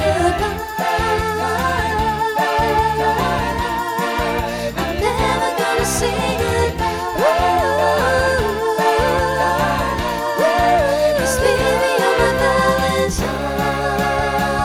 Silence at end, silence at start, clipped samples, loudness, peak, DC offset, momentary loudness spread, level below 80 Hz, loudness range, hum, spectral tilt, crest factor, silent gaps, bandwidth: 0 s; 0 s; under 0.1%; -17 LUFS; -2 dBFS; under 0.1%; 5 LU; -32 dBFS; 3 LU; none; -4.5 dB/octave; 16 dB; none; over 20 kHz